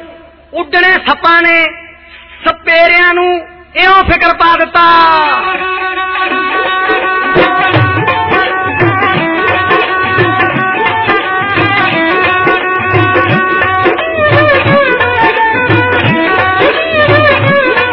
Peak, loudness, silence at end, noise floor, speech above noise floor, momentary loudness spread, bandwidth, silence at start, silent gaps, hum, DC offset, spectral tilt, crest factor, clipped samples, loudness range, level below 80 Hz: 0 dBFS; -8 LUFS; 0 s; -34 dBFS; 26 dB; 6 LU; 6 kHz; 0 s; none; none; under 0.1%; -2.5 dB/octave; 10 dB; under 0.1%; 2 LU; -36 dBFS